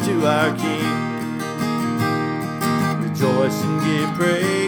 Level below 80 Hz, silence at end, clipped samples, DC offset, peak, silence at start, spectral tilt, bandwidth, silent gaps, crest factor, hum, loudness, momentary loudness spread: -58 dBFS; 0 s; under 0.1%; under 0.1%; -4 dBFS; 0 s; -5.5 dB/octave; over 20 kHz; none; 16 dB; none; -21 LUFS; 6 LU